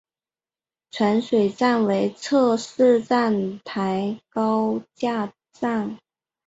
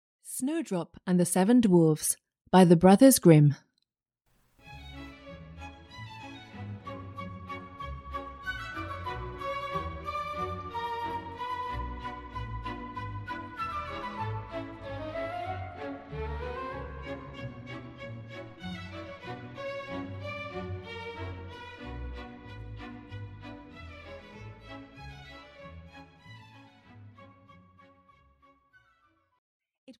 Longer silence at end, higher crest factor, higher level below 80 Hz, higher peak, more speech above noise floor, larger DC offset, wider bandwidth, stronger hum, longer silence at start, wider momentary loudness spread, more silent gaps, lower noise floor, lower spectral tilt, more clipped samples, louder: first, 0.5 s vs 0.1 s; second, 16 dB vs 26 dB; second, -66 dBFS vs -50 dBFS; about the same, -6 dBFS vs -6 dBFS; first, over 69 dB vs 59 dB; neither; second, 8 kHz vs 16 kHz; neither; first, 0.95 s vs 0.25 s; second, 9 LU vs 24 LU; second, none vs 29.38-29.60 s, 29.78-29.87 s; first, under -90 dBFS vs -80 dBFS; about the same, -6 dB/octave vs -6 dB/octave; neither; first, -22 LUFS vs -29 LUFS